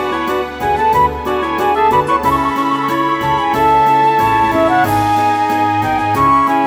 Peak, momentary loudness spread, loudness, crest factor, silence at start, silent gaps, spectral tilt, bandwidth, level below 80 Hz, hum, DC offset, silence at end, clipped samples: -2 dBFS; 6 LU; -13 LUFS; 12 dB; 0 s; none; -5.5 dB/octave; over 20 kHz; -36 dBFS; none; under 0.1%; 0 s; under 0.1%